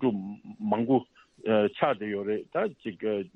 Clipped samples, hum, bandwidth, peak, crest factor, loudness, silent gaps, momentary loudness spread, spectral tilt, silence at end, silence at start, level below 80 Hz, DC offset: under 0.1%; none; 5 kHz; -10 dBFS; 20 dB; -29 LUFS; none; 11 LU; -9 dB/octave; 0.1 s; 0 s; -72 dBFS; under 0.1%